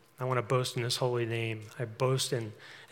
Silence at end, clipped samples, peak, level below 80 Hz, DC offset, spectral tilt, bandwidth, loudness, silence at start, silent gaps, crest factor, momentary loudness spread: 0.05 s; under 0.1%; -16 dBFS; -78 dBFS; under 0.1%; -4.5 dB/octave; 17 kHz; -32 LUFS; 0.2 s; none; 18 dB; 10 LU